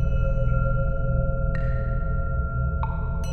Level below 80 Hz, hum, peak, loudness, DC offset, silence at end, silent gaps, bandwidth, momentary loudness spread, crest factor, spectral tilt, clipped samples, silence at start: -24 dBFS; none; -10 dBFS; -26 LUFS; under 0.1%; 0 s; none; 6.4 kHz; 3 LU; 12 dB; -9 dB/octave; under 0.1%; 0 s